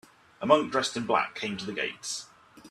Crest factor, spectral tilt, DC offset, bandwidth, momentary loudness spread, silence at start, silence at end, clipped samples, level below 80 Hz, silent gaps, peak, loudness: 24 dB; -3.5 dB/octave; under 0.1%; 13.5 kHz; 12 LU; 0.4 s; 0 s; under 0.1%; -70 dBFS; none; -6 dBFS; -28 LUFS